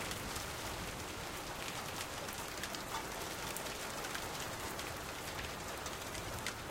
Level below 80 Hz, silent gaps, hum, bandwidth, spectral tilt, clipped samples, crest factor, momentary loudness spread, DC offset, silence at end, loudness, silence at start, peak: -56 dBFS; none; none; 17 kHz; -2.5 dB/octave; under 0.1%; 24 dB; 2 LU; under 0.1%; 0 s; -42 LUFS; 0 s; -20 dBFS